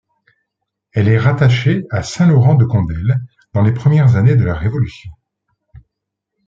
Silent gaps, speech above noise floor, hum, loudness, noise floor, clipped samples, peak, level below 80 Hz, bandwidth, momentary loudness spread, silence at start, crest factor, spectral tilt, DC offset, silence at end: none; 66 dB; none; -14 LUFS; -78 dBFS; under 0.1%; -2 dBFS; -40 dBFS; 7.6 kHz; 10 LU; 0.95 s; 14 dB; -8 dB/octave; under 0.1%; 1.35 s